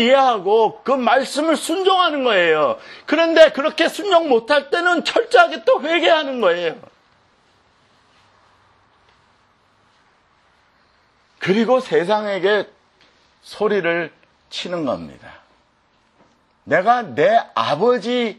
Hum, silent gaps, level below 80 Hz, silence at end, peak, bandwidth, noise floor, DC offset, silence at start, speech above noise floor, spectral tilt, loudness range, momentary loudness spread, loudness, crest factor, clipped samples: none; none; -66 dBFS; 0.05 s; 0 dBFS; 12.5 kHz; -60 dBFS; under 0.1%; 0 s; 43 dB; -4 dB/octave; 10 LU; 11 LU; -17 LUFS; 18 dB; under 0.1%